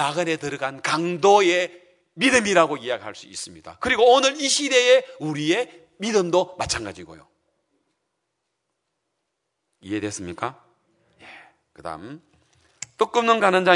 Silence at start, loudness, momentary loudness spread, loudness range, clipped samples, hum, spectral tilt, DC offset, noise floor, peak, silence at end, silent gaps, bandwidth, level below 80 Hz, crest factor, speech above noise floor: 0 s; -21 LUFS; 19 LU; 16 LU; under 0.1%; none; -3 dB/octave; under 0.1%; -78 dBFS; 0 dBFS; 0 s; none; 11 kHz; -60 dBFS; 22 dB; 57 dB